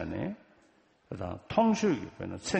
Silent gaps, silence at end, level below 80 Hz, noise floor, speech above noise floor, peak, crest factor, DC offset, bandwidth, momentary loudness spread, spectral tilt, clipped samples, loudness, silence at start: none; 0 s; -58 dBFS; -65 dBFS; 35 dB; -12 dBFS; 20 dB; under 0.1%; 8.4 kHz; 16 LU; -5.5 dB/octave; under 0.1%; -31 LUFS; 0 s